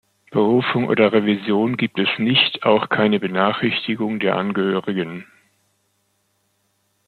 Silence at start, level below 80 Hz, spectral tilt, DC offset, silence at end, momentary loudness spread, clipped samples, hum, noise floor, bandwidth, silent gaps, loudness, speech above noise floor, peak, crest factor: 0.3 s; -64 dBFS; -7.5 dB/octave; under 0.1%; 1.85 s; 7 LU; under 0.1%; none; -67 dBFS; 4.7 kHz; none; -19 LUFS; 48 dB; -2 dBFS; 18 dB